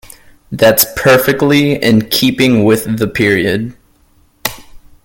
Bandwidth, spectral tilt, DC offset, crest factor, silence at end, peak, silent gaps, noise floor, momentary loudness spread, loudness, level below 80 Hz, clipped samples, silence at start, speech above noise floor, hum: 18 kHz; -4.5 dB/octave; under 0.1%; 12 dB; 0.3 s; 0 dBFS; none; -51 dBFS; 13 LU; -11 LUFS; -42 dBFS; under 0.1%; 0.5 s; 40 dB; none